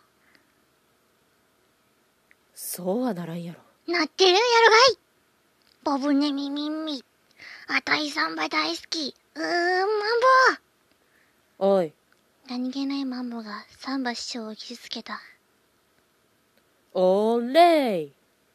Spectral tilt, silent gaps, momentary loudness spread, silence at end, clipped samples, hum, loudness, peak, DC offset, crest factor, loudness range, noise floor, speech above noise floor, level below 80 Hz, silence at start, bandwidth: -3.5 dB/octave; none; 19 LU; 0.45 s; under 0.1%; none; -23 LUFS; -4 dBFS; under 0.1%; 22 dB; 13 LU; -66 dBFS; 42 dB; -78 dBFS; 2.55 s; 14 kHz